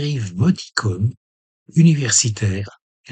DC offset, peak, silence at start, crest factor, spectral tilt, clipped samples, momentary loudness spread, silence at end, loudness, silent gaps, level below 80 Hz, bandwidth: under 0.1%; -2 dBFS; 0 s; 18 dB; -4.5 dB/octave; under 0.1%; 10 LU; 0 s; -18 LUFS; 1.17-1.66 s, 2.81-3.04 s; -54 dBFS; 9.4 kHz